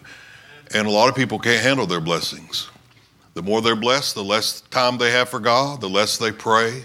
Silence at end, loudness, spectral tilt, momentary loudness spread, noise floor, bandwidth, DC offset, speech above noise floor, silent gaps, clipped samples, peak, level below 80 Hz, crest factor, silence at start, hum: 0 s; -19 LUFS; -3.5 dB/octave; 8 LU; -53 dBFS; 16.5 kHz; under 0.1%; 34 dB; none; under 0.1%; 0 dBFS; -62 dBFS; 20 dB; 0.05 s; none